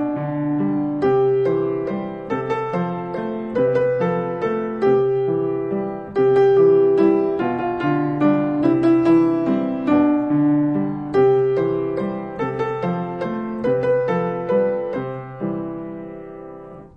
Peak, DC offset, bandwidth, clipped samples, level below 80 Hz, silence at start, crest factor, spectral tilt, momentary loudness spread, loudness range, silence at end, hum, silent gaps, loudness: -6 dBFS; under 0.1%; 5.8 kHz; under 0.1%; -54 dBFS; 0 s; 14 dB; -9.5 dB/octave; 11 LU; 5 LU; 0.1 s; none; none; -20 LUFS